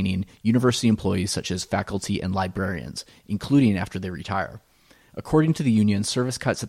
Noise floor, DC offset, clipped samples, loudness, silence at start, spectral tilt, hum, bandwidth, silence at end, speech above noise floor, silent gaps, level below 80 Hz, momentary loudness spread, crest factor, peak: -49 dBFS; under 0.1%; under 0.1%; -24 LUFS; 0 s; -5.5 dB/octave; none; 15 kHz; 0 s; 26 dB; none; -50 dBFS; 12 LU; 16 dB; -8 dBFS